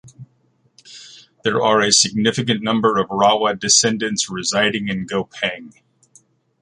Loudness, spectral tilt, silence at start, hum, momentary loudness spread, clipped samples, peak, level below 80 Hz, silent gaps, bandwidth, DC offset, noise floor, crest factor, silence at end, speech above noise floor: -17 LUFS; -2.5 dB/octave; 0.05 s; none; 11 LU; under 0.1%; -2 dBFS; -58 dBFS; none; 11.5 kHz; under 0.1%; -61 dBFS; 18 dB; 0.9 s; 43 dB